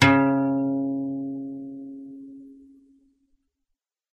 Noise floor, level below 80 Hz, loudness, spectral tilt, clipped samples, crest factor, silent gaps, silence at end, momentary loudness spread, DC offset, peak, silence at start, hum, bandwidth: -80 dBFS; -60 dBFS; -25 LUFS; -6 dB/octave; under 0.1%; 24 dB; none; 1.6 s; 22 LU; under 0.1%; -2 dBFS; 0 s; none; 9.4 kHz